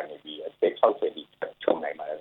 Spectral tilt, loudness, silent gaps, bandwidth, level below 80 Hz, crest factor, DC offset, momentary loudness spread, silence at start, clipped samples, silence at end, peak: -7 dB/octave; -28 LUFS; none; 4.2 kHz; -76 dBFS; 22 dB; under 0.1%; 15 LU; 0 s; under 0.1%; 0 s; -6 dBFS